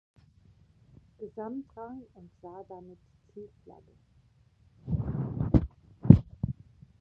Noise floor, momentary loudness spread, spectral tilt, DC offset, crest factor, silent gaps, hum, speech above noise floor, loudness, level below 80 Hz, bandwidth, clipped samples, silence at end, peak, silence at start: -63 dBFS; 28 LU; -12 dB/octave; under 0.1%; 30 dB; none; none; 19 dB; -27 LUFS; -42 dBFS; 4.1 kHz; under 0.1%; 0.5 s; 0 dBFS; 1.2 s